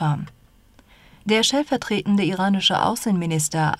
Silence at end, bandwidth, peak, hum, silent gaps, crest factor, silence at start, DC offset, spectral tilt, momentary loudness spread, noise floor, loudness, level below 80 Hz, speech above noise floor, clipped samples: 0.05 s; 15 kHz; -6 dBFS; none; none; 16 dB; 0 s; under 0.1%; -4 dB/octave; 8 LU; -53 dBFS; -21 LUFS; -56 dBFS; 33 dB; under 0.1%